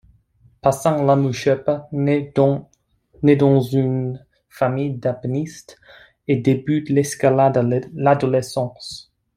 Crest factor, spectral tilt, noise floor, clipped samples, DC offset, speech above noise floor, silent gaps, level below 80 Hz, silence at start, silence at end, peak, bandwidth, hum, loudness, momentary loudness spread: 18 dB; -7 dB/octave; -57 dBFS; under 0.1%; under 0.1%; 38 dB; none; -56 dBFS; 0.65 s; 0.35 s; -2 dBFS; 15 kHz; none; -19 LUFS; 12 LU